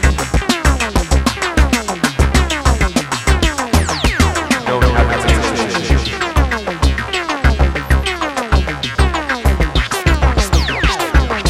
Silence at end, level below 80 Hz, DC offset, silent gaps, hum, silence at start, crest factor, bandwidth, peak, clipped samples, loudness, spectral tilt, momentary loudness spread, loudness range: 0 s; -18 dBFS; under 0.1%; none; none; 0 s; 14 dB; 15 kHz; 0 dBFS; under 0.1%; -15 LUFS; -4.5 dB/octave; 3 LU; 2 LU